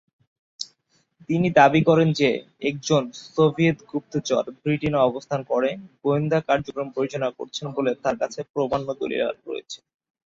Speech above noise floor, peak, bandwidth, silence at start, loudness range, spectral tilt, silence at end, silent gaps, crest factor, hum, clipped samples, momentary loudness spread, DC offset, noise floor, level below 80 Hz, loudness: 44 dB; -2 dBFS; 7.8 kHz; 0.6 s; 5 LU; -6 dB/octave; 0.5 s; 8.50-8.54 s; 20 dB; none; under 0.1%; 14 LU; under 0.1%; -67 dBFS; -58 dBFS; -23 LUFS